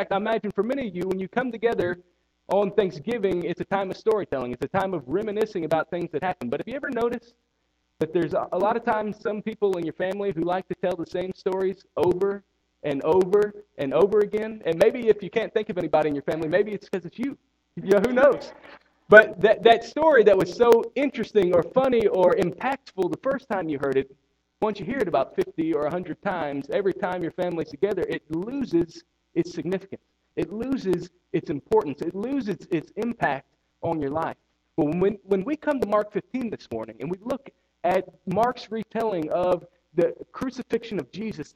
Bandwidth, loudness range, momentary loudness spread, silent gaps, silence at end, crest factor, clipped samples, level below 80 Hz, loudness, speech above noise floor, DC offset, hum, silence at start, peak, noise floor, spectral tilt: 17 kHz; 9 LU; 12 LU; none; 0.1 s; 24 dB; under 0.1%; -58 dBFS; -25 LUFS; 49 dB; under 0.1%; none; 0 s; 0 dBFS; -73 dBFS; -6.5 dB/octave